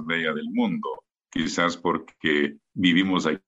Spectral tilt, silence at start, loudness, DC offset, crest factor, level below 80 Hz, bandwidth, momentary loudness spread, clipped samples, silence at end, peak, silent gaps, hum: -4.5 dB/octave; 0 s; -24 LUFS; under 0.1%; 18 dB; -60 dBFS; 8 kHz; 10 LU; under 0.1%; 0.1 s; -6 dBFS; none; none